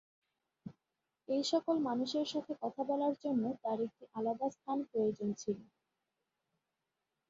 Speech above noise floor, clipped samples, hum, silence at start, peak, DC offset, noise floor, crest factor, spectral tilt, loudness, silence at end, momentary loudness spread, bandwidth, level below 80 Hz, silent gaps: 52 dB; under 0.1%; none; 0.65 s; -20 dBFS; under 0.1%; -88 dBFS; 18 dB; -5 dB/octave; -37 LUFS; 1.65 s; 8 LU; 7.4 kHz; -82 dBFS; none